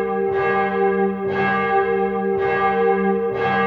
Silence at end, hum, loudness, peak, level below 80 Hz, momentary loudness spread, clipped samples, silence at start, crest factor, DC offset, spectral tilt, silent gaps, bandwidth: 0 s; none; -19 LUFS; -6 dBFS; -52 dBFS; 3 LU; under 0.1%; 0 s; 12 dB; under 0.1%; -8.5 dB/octave; none; 5.6 kHz